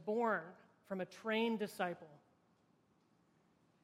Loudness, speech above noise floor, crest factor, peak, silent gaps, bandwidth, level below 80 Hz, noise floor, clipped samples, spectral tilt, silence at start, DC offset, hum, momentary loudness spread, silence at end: -40 LUFS; 35 dB; 20 dB; -24 dBFS; none; 16 kHz; -90 dBFS; -75 dBFS; under 0.1%; -5.5 dB/octave; 0 s; under 0.1%; none; 12 LU; 1.65 s